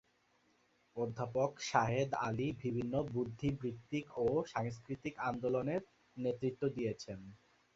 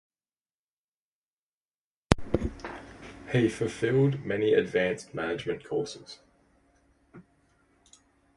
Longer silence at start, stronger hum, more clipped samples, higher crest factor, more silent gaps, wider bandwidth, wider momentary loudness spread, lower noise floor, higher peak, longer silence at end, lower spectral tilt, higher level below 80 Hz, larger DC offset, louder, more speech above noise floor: second, 0.95 s vs 2.1 s; neither; neither; second, 24 dB vs 30 dB; neither; second, 7.8 kHz vs 11.5 kHz; second, 9 LU vs 19 LU; second, -74 dBFS vs under -90 dBFS; second, -14 dBFS vs 0 dBFS; second, 0.4 s vs 1.15 s; about the same, -6 dB/octave vs -6.5 dB/octave; second, -66 dBFS vs -48 dBFS; neither; second, -38 LUFS vs -28 LUFS; second, 37 dB vs over 62 dB